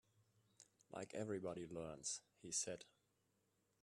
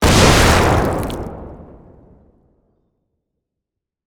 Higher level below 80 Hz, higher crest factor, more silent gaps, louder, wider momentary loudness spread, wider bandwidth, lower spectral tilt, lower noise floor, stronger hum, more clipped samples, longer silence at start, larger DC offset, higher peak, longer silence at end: second, -82 dBFS vs -26 dBFS; about the same, 22 dB vs 18 dB; neither; second, -48 LUFS vs -13 LUFS; second, 12 LU vs 23 LU; second, 13 kHz vs over 20 kHz; second, -3 dB/octave vs -4.5 dB/octave; about the same, -84 dBFS vs -82 dBFS; neither; neither; first, 0.6 s vs 0 s; neither; second, -30 dBFS vs 0 dBFS; second, 0.95 s vs 2.4 s